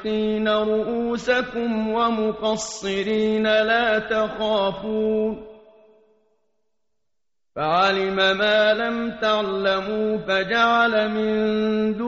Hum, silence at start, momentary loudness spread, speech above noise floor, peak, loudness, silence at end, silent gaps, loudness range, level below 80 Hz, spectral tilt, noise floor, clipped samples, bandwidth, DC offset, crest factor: none; 0 s; 6 LU; 64 dB; -6 dBFS; -21 LUFS; 0 s; none; 6 LU; -54 dBFS; -2.5 dB/octave; -85 dBFS; under 0.1%; 8 kHz; under 0.1%; 16 dB